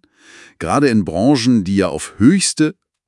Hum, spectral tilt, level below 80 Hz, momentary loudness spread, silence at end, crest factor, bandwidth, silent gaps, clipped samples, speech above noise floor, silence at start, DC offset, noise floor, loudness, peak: none; -5 dB/octave; -50 dBFS; 7 LU; 0.35 s; 16 dB; 12 kHz; none; under 0.1%; 30 dB; 0.6 s; under 0.1%; -44 dBFS; -15 LUFS; 0 dBFS